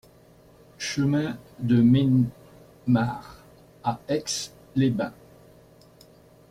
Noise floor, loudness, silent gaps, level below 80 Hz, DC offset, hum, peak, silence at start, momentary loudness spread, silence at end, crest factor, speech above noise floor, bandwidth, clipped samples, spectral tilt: -54 dBFS; -25 LUFS; none; -58 dBFS; under 0.1%; none; -10 dBFS; 0.8 s; 14 LU; 1.4 s; 16 dB; 31 dB; 15 kHz; under 0.1%; -6 dB/octave